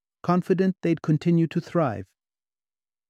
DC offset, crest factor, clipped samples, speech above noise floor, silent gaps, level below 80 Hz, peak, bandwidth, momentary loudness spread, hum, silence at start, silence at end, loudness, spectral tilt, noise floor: under 0.1%; 16 dB; under 0.1%; over 67 dB; none; -68 dBFS; -8 dBFS; 8 kHz; 4 LU; none; 0.25 s; 1.05 s; -24 LUFS; -9 dB/octave; under -90 dBFS